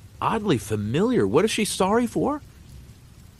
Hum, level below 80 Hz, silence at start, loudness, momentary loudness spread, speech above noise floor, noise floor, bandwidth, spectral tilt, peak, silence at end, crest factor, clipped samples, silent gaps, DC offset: none; -50 dBFS; 0.05 s; -23 LUFS; 6 LU; 25 dB; -47 dBFS; 13 kHz; -5 dB/octave; -8 dBFS; 0.45 s; 16 dB; under 0.1%; none; under 0.1%